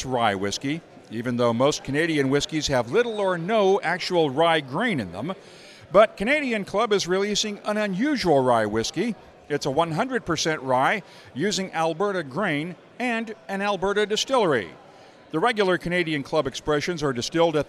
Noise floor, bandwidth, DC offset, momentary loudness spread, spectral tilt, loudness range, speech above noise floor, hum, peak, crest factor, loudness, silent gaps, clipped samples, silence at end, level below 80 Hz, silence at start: -49 dBFS; 13.5 kHz; under 0.1%; 9 LU; -4.5 dB/octave; 3 LU; 25 dB; none; -4 dBFS; 20 dB; -24 LUFS; none; under 0.1%; 0 s; -54 dBFS; 0 s